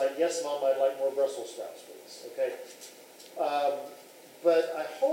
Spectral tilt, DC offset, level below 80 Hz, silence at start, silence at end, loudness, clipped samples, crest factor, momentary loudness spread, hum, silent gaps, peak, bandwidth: -2.5 dB/octave; under 0.1%; under -90 dBFS; 0 s; 0 s; -30 LUFS; under 0.1%; 18 dB; 20 LU; none; none; -12 dBFS; 16 kHz